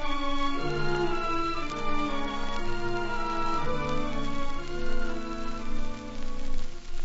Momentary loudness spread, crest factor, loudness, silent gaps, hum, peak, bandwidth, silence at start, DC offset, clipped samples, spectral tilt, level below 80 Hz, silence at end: 10 LU; 12 dB; -32 LUFS; none; none; -14 dBFS; 7.6 kHz; 0 s; under 0.1%; under 0.1%; -4 dB/octave; -32 dBFS; 0 s